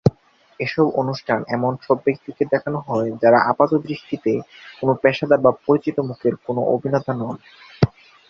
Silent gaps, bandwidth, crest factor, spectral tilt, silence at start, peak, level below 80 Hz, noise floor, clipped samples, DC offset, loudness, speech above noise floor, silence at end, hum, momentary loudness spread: none; 6.8 kHz; 20 dB; -8.5 dB/octave; 0.05 s; 0 dBFS; -50 dBFS; -51 dBFS; under 0.1%; under 0.1%; -20 LUFS; 31 dB; 0.4 s; none; 9 LU